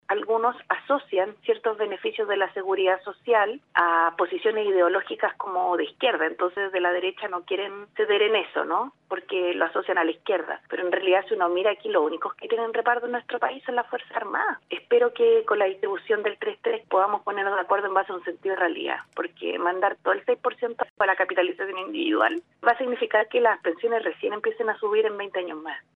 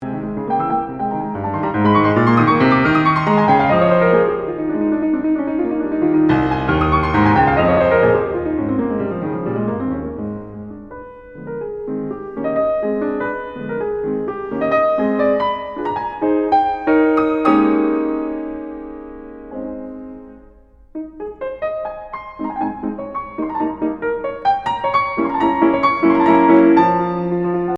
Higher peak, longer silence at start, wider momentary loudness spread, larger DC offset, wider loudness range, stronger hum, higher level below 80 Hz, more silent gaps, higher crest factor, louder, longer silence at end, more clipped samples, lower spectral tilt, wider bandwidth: second, -4 dBFS vs 0 dBFS; about the same, 0.1 s vs 0 s; second, 8 LU vs 17 LU; neither; second, 2 LU vs 12 LU; neither; second, -84 dBFS vs -42 dBFS; first, 20.90-20.96 s vs none; about the same, 20 dB vs 18 dB; second, -25 LUFS vs -17 LUFS; first, 0.15 s vs 0 s; neither; second, -6 dB/octave vs -9 dB/octave; second, 4.2 kHz vs 5.8 kHz